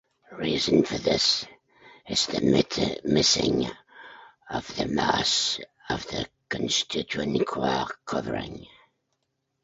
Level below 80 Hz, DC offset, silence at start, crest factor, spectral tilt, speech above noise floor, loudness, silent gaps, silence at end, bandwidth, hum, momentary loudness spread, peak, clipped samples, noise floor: -52 dBFS; under 0.1%; 0.3 s; 22 dB; -3.5 dB/octave; 52 dB; -25 LUFS; none; 0.95 s; 8.2 kHz; none; 12 LU; -6 dBFS; under 0.1%; -78 dBFS